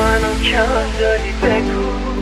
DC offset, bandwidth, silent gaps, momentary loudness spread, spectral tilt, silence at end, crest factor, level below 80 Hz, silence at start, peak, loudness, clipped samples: under 0.1%; 13.5 kHz; none; 5 LU; -5 dB/octave; 0 s; 14 dB; -22 dBFS; 0 s; -2 dBFS; -17 LUFS; under 0.1%